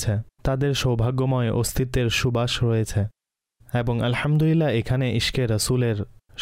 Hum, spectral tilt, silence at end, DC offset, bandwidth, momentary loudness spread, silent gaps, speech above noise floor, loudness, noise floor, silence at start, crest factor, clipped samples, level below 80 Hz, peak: none; -5.5 dB/octave; 0 s; under 0.1%; 16 kHz; 6 LU; none; 40 dB; -23 LUFS; -62 dBFS; 0 s; 10 dB; under 0.1%; -40 dBFS; -12 dBFS